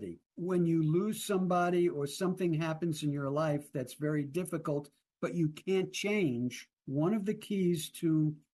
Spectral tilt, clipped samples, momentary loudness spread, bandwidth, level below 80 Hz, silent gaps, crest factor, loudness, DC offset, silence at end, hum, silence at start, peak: -6.5 dB/octave; under 0.1%; 8 LU; 12.5 kHz; -74 dBFS; 0.26-0.30 s; 12 dB; -33 LUFS; under 0.1%; 0.15 s; none; 0 s; -22 dBFS